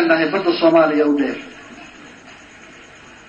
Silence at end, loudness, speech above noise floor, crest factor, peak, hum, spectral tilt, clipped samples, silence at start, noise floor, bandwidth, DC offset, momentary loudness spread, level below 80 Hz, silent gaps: 1 s; -16 LUFS; 26 dB; 16 dB; -2 dBFS; none; -6 dB/octave; under 0.1%; 0 s; -42 dBFS; 7.6 kHz; under 0.1%; 24 LU; -60 dBFS; none